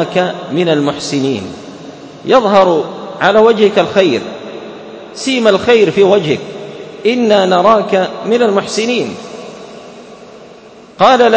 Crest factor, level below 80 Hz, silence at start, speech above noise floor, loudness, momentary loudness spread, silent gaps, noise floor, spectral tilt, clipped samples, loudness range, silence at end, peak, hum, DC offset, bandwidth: 12 dB; -52 dBFS; 0 s; 26 dB; -12 LUFS; 20 LU; none; -37 dBFS; -5 dB/octave; 0.3%; 3 LU; 0 s; 0 dBFS; none; under 0.1%; 8 kHz